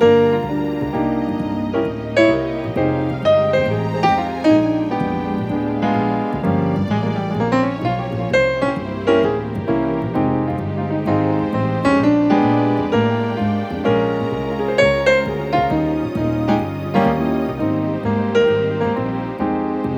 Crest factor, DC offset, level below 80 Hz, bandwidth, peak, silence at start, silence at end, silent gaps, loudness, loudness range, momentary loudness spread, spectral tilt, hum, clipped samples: 16 dB; under 0.1%; -42 dBFS; 8.6 kHz; -2 dBFS; 0 s; 0 s; none; -18 LUFS; 2 LU; 7 LU; -7.5 dB/octave; none; under 0.1%